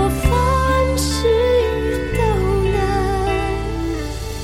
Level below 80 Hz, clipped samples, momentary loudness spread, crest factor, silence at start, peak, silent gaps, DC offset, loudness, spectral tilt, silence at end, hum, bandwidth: -24 dBFS; under 0.1%; 7 LU; 14 dB; 0 s; -4 dBFS; none; 0.7%; -18 LUFS; -5.5 dB/octave; 0 s; none; 16 kHz